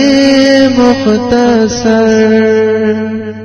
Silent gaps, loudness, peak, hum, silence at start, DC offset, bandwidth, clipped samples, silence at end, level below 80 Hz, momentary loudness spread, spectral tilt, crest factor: none; -8 LUFS; 0 dBFS; none; 0 s; under 0.1%; 11 kHz; 1%; 0 s; -38 dBFS; 5 LU; -5 dB/octave; 8 dB